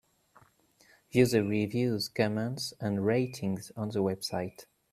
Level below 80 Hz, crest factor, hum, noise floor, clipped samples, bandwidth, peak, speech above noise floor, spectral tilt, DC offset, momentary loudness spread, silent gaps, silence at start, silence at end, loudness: -66 dBFS; 22 dB; none; -64 dBFS; under 0.1%; 15.5 kHz; -10 dBFS; 34 dB; -6 dB/octave; under 0.1%; 10 LU; none; 1.15 s; 0.3 s; -31 LUFS